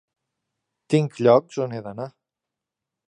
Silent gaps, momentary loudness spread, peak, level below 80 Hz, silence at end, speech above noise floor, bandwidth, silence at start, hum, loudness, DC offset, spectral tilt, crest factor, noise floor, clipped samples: none; 17 LU; -4 dBFS; -68 dBFS; 1 s; 65 dB; 10.5 kHz; 0.9 s; none; -21 LUFS; under 0.1%; -7.5 dB/octave; 22 dB; -86 dBFS; under 0.1%